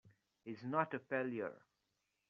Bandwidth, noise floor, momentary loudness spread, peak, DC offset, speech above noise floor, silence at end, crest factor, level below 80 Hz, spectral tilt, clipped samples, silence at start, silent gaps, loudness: 7 kHz; -86 dBFS; 13 LU; -20 dBFS; under 0.1%; 44 dB; 0.7 s; 24 dB; -90 dBFS; -5.5 dB/octave; under 0.1%; 0.05 s; none; -41 LUFS